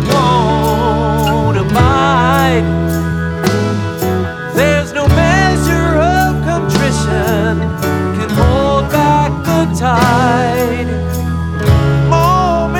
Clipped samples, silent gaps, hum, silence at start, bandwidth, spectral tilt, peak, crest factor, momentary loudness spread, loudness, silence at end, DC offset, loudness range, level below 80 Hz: under 0.1%; none; none; 0 s; 19.5 kHz; -6 dB/octave; 0 dBFS; 12 dB; 6 LU; -12 LUFS; 0 s; under 0.1%; 1 LU; -24 dBFS